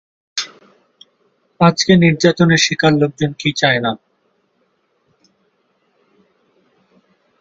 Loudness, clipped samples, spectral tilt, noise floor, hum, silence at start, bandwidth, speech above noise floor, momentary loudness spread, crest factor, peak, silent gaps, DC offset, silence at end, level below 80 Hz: -14 LUFS; under 0.1%; -5 dB/octave; -63 dBFS; none; 0.35 s; 7.8 kHz; 50 dB; 13 LU; 18 dB; 0 dBFS; none; under 0.1%; 3.45 s; -54 dBFS